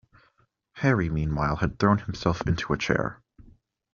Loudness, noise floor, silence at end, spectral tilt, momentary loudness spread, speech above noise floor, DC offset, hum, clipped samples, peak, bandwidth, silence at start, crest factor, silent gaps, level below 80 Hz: -26 LUFS; -67 dBFS; 0.8 s; -6 dB/octave; 4 LU; 42 dB; under 0.1%; none; under 0.1%; -6 dBFS; 7.2 kHz; 0.75 s; 22 dB; none; -44 dBFS